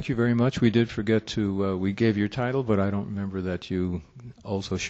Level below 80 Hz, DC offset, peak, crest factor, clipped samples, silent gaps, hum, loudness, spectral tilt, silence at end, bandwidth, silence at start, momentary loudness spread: -52 dBFS; under 0.1%; -8 dBFS; 18 dB; under 0.1%; none; none; -26 LUFS; -7 dB/octave; 0 s; 8 kHz; 0 s; 9 LU